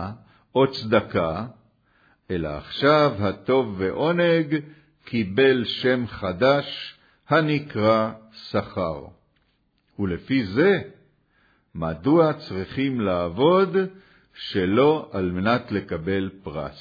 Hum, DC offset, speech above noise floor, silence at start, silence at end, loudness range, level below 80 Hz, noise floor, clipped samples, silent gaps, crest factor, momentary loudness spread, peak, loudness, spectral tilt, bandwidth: none; under 0.1%; 45 dB; 0 s; 0 s; 4 LU; -52 dBFS; -67 dBFS; under 0.1%; none; 18 dB; 12 LU; -6 dBFS; -23 LUFS; -8 dB/octave; 5 kHz